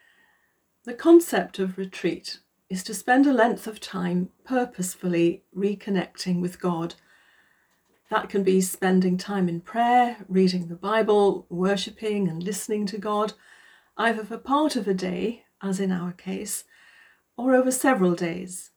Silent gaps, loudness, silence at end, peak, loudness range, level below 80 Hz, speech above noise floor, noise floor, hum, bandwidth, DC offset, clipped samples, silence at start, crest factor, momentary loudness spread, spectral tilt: none; -24 LUFS; 0.1 s; -6 dBFS; 5 LU; -68 dBFS; 45 dB; -69 dBFS; none; over 20 kHz; under 0.1%; under 0.1%; 0.85 s; 20 dB; 12 LU; -5.5 dB/octave